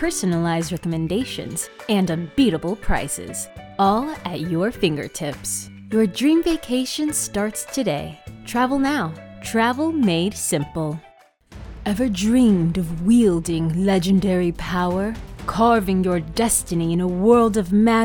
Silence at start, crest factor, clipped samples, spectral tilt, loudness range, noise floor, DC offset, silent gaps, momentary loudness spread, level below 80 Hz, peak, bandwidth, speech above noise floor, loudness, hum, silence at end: 0 s; 18 dB; under 0.1%; -5 dB/octave; 4 LU; -45 dBFS; under 0.1%; none; 11 LU; -38 dBFS; -4 dBFS; 18 kHz; 25 dB; -21 LUFS; none; 0 s